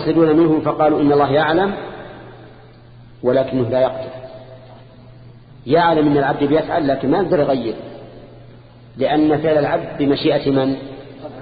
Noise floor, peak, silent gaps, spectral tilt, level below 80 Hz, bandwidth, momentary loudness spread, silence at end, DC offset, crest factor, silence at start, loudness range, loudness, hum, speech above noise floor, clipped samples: -42 dBFS; -4 dBFS; none; -12 dB/octave; -48 dBFS; 5 kHz; 21 LU; 0 s; under 0.1%; 14 dB; 0 s; 5 LU; -17 LUFS; none; 26 dB; under 0.1%